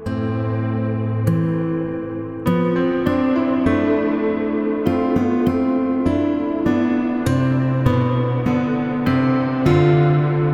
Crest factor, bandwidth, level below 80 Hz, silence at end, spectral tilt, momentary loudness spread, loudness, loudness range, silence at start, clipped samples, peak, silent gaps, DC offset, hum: 14 dB; 13.5 kHz; -44 dBFS; 0 s; -9 dB/octave; 5 LU; -19 LUFS; 2 LU; 0 s; under 0.1%; -4 dBFS; none; under 0.1%; none